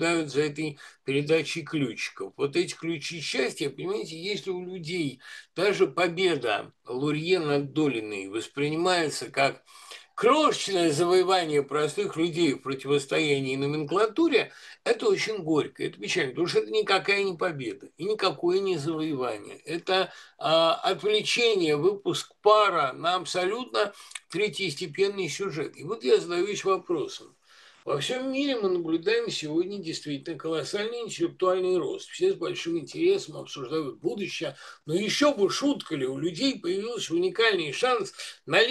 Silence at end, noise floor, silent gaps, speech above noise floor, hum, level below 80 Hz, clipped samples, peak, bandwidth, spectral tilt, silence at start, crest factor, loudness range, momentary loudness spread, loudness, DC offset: 0 s; -56 dBFS; none; 29 dB; none; -78 dBFS; under 0.1%; -6 dBFS; 12.5 kHz; -4 dB/octave; 0 s; 20 dB; 4 LU; 11 LU; -27 LUFS; under 0.1%